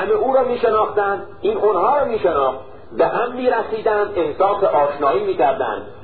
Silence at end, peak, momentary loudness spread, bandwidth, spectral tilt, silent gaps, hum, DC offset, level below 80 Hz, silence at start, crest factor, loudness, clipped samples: 0 s; -4 dBFS; 6 LU; 4.6 kHz; -10.5 dB/octave; none; none; 1%; -50 dBFS; 0 s; 14 dB; -18 LUFS; under 0.1%